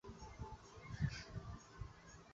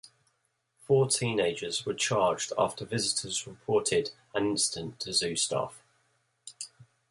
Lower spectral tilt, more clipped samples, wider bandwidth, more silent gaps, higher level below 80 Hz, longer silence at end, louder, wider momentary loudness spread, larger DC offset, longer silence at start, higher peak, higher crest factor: first, -5.5 dB/octave vs -3 dB/octave; neither; second, 7.8 kHz vs 11.5 kHz; neither; first, -58 dBFS vs -64 dBFS; second, 0 s vs 0.3 s; second, -50 LUFS vs -29 LUFS; about the same, 12 LU vs 14 LU; neither; about the same, 0.05 s vs 0.05 s; second, -28 dBFS vs -12 dBFS; about the same, 22 dB vs 18 dB